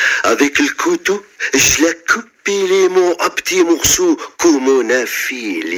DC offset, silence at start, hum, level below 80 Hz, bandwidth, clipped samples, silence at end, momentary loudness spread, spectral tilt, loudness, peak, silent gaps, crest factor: under 0.1%; 0 s; none; -44 dBFS; over 20 kHz; under 0.1%; 0 s; 7 LU; -2 dB/octave; -14 LUFS; 0 dBFS; none; 14 dB